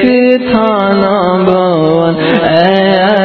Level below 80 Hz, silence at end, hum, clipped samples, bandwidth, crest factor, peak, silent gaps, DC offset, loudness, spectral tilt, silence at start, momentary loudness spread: -42 dBFS; 0 s; none; 0.5%; 6 kHz; 8 dB; 0 dBFS; none; under 0.1%; -9 LUFS; -8.5 dB/octave; 0 s; 2 LU